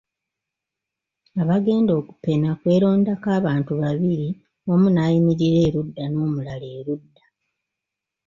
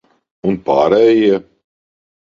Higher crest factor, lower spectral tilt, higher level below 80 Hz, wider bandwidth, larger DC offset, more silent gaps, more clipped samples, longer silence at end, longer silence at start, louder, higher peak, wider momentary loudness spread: about the same, 14 dB vs 16 dB; first, -9 dB/octave vs -7.5 dB/octave; about the same, -54 dBFS vs -52 dBFS; about the same, 7.2 kHz vs 7.2 kHz; neither; neither; neither; first, 1.3 s vs 0.85 s; first, 1.35 s vs 0.45 s; second, -21 LUFS vs -14 LUFS; second, -8 dBFS vs 0 dBFS; first, 13 LU vs 10 LU